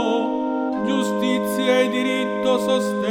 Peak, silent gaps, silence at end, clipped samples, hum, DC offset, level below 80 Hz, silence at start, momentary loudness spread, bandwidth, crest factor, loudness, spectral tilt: -6 dBFS; none; 0 s; under 0.1%; none; under 0.1%; -62 dBFS; 0 s; 5 LU; 17.5 kHz; 14 dB; -21 LUFS; -4.5 dB/octave